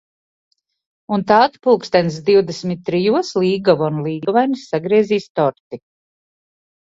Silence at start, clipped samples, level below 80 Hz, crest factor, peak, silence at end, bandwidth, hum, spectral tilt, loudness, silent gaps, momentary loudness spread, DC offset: 1.1 s; under 0.1%; -58 dBFS; 18 dB; 0 dBFS; 1.15 s; 7.8 kHz; none; -6.5 dB/octave; -17 LUFS; 5.30-5.35 s, 5.60-5.71 s; 9 LU; under 0.1%